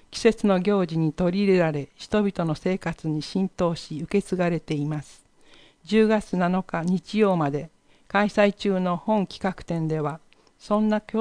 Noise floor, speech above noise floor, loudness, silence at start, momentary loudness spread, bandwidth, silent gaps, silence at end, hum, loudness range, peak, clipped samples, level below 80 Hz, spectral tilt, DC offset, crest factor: -53 dBFS; 30 dB; -24 LUFS; 0.1 s; 8 LU; 10.5 kHz; none; 0 s; none; 3 LU; -6 dBFS; under 0.1%; -52 dBFS; -7 dB/octave; under 0.1%; 18 dB